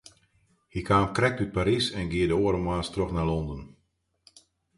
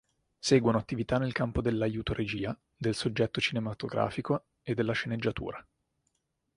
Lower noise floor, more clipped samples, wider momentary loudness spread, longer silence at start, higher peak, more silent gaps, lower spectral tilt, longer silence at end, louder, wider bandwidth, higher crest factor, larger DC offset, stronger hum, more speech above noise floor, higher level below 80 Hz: second, -73 dBFS vs -79 dBFS; neither; first, 12 LU vs 9 LU; first, 0.75 s vs 0.45 s; about the same, -8 dBFS vs -10 dBFS; neither; about the same, -6 dB/octave vs -5.5 dB/octave; first, 1.1 s vs 0.95 s; first, -27 LUFS vs -31 LUFS; about the same, 11.5 kHz vs 11.5 kHz; about the same, 20 dB vs 22 dB; neither; neither; about the same, 47 dB vs 48 dB; first, -44 dBFS vs -52 dBFS